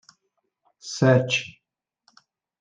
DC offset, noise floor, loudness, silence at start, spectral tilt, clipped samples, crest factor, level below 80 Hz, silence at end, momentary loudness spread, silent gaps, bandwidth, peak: under 0.1%; -82 dBFS; -21 LUFS; 0.85 s; -5.5 dB/octave; under 0.1%; 20 dB; -68 dBFS; 1.1 s; 22 LU; none; 9.4 kHz; -6 dBFS